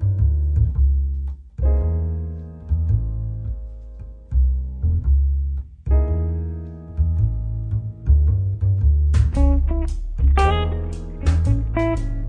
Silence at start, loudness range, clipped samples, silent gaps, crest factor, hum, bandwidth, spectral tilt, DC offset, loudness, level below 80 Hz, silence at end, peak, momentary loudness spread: 0 s; 5 LU; under 0.1%; none; 14 dB; none; 5.8 kHz; -8.5 dB/octave; under 0.1%; -21 LUFS; -20 dBFS; 0 s; -4 dBFS; 12 LU